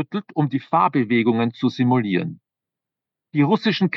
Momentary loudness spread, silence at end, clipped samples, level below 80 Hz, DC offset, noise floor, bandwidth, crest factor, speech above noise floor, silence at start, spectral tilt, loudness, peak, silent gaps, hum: 7 LU; 0 s; under 0.1%; -80 dBFS; under 0.1%; -87 dBFS; 6.4 kHz; 16 dB; 67 dB; 0 s; -8 dB/octave; -20 LUFS; -4 dBFS; none; none